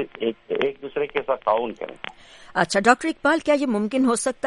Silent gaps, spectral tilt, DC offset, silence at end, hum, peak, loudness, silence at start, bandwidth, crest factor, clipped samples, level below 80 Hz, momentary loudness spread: none; -4 dB/octave; under 0.1%; 0 s; none; -2 dBFS; -22 LUFS; 0 s; 11.5 kHz; 20 dB; under 0.1%; -58 dBFS; 12 LU